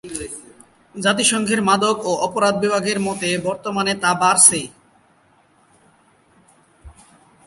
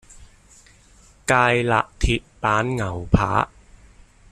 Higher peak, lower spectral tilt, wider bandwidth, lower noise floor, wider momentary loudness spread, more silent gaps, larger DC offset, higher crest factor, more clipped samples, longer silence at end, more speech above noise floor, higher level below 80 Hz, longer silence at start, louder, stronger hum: about the same, 0 dBFS vs -2 dBFS; second, -2.5 dB/octave vs -5.5 dB/octave; second, 12.5 kHz vs 14 kHz; first, -56 dBFS vs -52 dBFS; first, 18 LU vs 8 LU; neither; neither; about the same, 20 dB vs 20 dB; neither; second, 0.55 s vs 0.85 s; first, 38 dB vs 32 dB; second, -54 dBFS vs -34 dBFS; second, 0.05 s vs 0.2 s; first, -17 LUFS vs -21 LUFS; neither